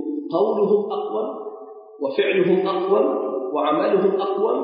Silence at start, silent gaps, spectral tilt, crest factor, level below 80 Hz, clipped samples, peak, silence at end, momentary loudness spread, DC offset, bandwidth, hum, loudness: 0 s; none; -11 dB/octave; 14 dB; -80 dBFS; under 0.1%; -6 dBFS; 0 s; 11 LU; under 0.1%; 5.2 kHz; none; -21 LUFS